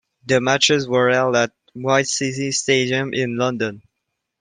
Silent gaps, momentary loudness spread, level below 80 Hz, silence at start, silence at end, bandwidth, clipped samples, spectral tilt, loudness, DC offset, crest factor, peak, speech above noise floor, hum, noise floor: none; 8 LU; -62 dBFS; 0.25 s; 0.6 s; 10.5 kHz; under 0.1%; -3.5 dB/octave; -19 LUFS; under 0.1%; 18 dB; -2 dBFS; 59 dB; none; -78 dBFS